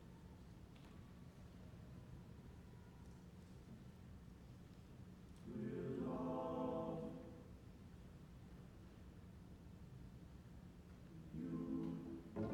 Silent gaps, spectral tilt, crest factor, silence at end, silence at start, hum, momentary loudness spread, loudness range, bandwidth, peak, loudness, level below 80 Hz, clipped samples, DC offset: none; -8.5 dB/octave; 18 dB; 0 s; 0 s; none; 15 LU; 11 LU; 18 kHz; -32 dBFS; -53 LUFS; -66 dBFS; under 0.1%; under 0.1%